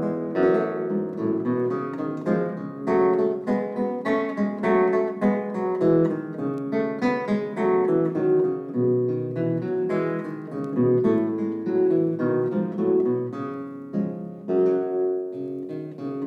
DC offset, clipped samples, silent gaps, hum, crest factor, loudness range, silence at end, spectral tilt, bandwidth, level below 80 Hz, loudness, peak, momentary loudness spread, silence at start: under 0.1%; under 0.1%; none; none; 14 dB; 2 LU; 0 s; -9.5 dB/octave; 6 kHz; -66 dBFS; -24 LUFS; -8 dBFS; 10 LU; 0 s